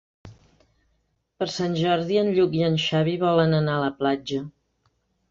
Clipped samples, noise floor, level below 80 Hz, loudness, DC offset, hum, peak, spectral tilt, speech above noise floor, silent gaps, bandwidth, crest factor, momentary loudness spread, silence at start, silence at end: under 0.1%; -71 dBFS; -58 dBFS; -23 LUFS; under 0.1%; none; -6 dBFS; -6.5 dB/octave; 49 dB; none; 7.6 kHz; 18 dB; 10 LU; 0.25 s; 0.8 s